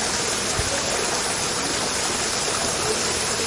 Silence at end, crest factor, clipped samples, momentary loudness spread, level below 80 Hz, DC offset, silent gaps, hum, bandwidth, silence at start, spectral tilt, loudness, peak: 0 s; 14 dB; under 0.1%; 1 LU; -44 dBFS; under 0.1%; none; none; 11.5 kHz; 0 s; -1.5 dB/octave; -22 LUFS; -10 dBFS